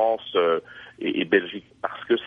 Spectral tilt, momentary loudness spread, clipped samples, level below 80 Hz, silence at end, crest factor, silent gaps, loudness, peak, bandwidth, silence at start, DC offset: -7 dB/octave; 12 LU; under 0.1%; -68 dBFS; 0 s; 18 dB; none; -25 LUFS; -6 dBFS; 4.7 kHz; 0 s; under 0.1%